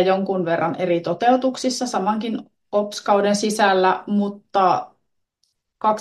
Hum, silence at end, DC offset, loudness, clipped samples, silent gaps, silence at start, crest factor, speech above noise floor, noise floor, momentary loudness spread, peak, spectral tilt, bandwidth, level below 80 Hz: none; 0 s; under 0.1%; -20 LUFS; under 0.1%; none; 0 s; 18 dB; 52 dB; -72 dBFS; 7 LU; -2 dBFS; -4.5 dB/octave; 12.5 kHz; -70 dBFS